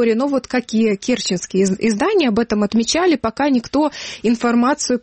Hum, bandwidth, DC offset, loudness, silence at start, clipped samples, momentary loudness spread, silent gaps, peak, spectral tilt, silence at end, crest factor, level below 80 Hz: none; 8.8 kHz; under 0.1%; -17 LUFS; 0 s; under 0.1%; 4 LU; none; -6 dBFS; -4.5 dB/octave; 0.05 s; 10 dB; -48 dBFS